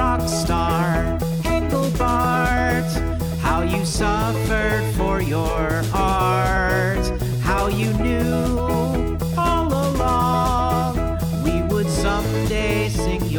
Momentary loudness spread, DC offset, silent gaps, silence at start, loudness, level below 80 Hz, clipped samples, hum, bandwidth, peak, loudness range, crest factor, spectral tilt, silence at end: 4 LU; under 0.1%; none; 0 s; -20 LUFS; -28 dBFS; under 0.1%; none; over 20 kHz; -6 dBFS; 1 LU; 12 dB; -6 dB/octave; 0 s